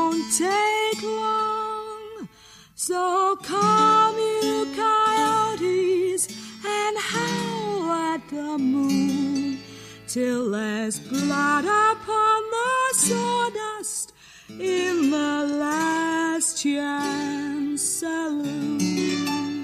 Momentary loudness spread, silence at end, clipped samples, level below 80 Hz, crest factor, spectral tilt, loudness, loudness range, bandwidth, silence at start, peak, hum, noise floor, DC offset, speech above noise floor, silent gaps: 10 LU; 0 s; under 0.1%; -64 dBFS; 16 dB; -3 dB/octave; -23 LUFS; 4 LU; 15.5 kHz; 0 s; -8 dBFS; none; -50 dBFS; under 0.1%; 27 dB; none